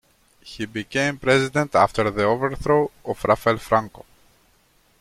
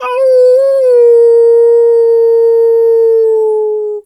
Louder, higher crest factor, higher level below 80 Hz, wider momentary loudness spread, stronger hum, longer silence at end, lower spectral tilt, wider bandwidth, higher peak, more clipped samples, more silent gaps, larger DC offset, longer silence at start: second, -21 LUFS vs -8 LUFS; first, 20 dB vs 6 dB; first, -48 dBFS vs -70 dBFS; first, 11 LU vs 5 LU; neither; first, 1.1 s vs 0.05 s; first, -5.5 dB/octave vs -2.5 dB/octave; first, 15.5 kHz vs 8.4 kHz; about the same, -2 dBFS vs -2 dBFS; neither; neither; neither; first, 0.45 s vs 0 s